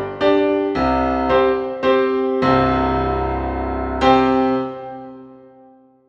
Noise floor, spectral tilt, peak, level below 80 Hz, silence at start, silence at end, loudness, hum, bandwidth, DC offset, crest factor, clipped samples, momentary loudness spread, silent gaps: -49 dBFS; -7.5 dB/octave; 0 dBFS; -34 dBFS; 0 s; 0.7 s; -18 LUFS; none; 7 kHz; under 0.1%; 18 dB; under 0.1%; 8 LU; none